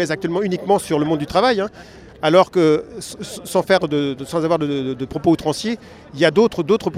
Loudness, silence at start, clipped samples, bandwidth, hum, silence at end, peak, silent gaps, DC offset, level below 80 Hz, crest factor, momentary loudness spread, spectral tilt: -18 LUFS; 0 s; under 0.1%; 15 kHz; none; 0 s; 0 dBFS; none; under 0.1%; -50 dBFS; 18 dB; 12 LU; -5.5 dB/octave